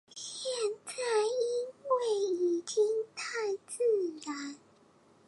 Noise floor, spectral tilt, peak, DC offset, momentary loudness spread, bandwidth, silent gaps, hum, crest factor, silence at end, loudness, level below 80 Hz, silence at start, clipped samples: -63 dBFS; -2 dB/octave; -18 dBFS; under 0.1%; 10 LU; 11.5 kHz; none; none; 14 dB; 0.7 s; -33 LUFS; -86 dBFS; 0.15 s; under 0.1%